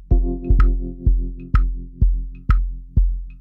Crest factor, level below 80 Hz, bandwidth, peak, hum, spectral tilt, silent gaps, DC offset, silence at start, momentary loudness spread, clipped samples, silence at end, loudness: 14 dB; -18 dBFS; 3 kHz; -4 dBFS; none; -10 dB/octave; none; under 0.1%; 0 s; 6 LU; under 0.1%; 0 s; -22 LUFS